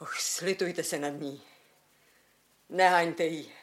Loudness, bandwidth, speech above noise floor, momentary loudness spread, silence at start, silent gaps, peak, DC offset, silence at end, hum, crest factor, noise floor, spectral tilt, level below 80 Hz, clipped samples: -29 LUFS; 16.5 kHz; 37 dB; 15 LU; 0 s; none; -10 dBFS; under 0.1%; 0 s; none; 22 dB; -66 dBFS; -3 dB/octave; -84 dBFS; under 0.1%